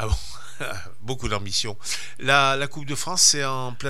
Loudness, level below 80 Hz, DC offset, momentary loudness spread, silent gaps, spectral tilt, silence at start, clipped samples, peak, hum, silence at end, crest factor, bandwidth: -22 LUFS; -38 dBFS; 4%; 17 LU; none; -2 dB/octave; 0 s; under 0.1%; -2 dBFS; none; 0 s; 24 dB; 17 kHz